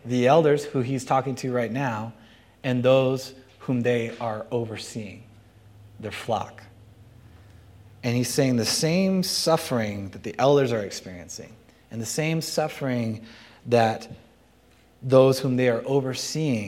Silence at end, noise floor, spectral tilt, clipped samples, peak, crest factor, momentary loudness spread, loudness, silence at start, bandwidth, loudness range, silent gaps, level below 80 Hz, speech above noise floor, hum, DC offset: 0 s; -57 dBFS; -5 dB/octave; under 0.1%; -4 dBFS; 20 dB; 18 LU; -24 LUFS; 0.05 s; 16.5 kHz; 9 LU; none; -62 dBFS; 33 dB; none; under 0.1%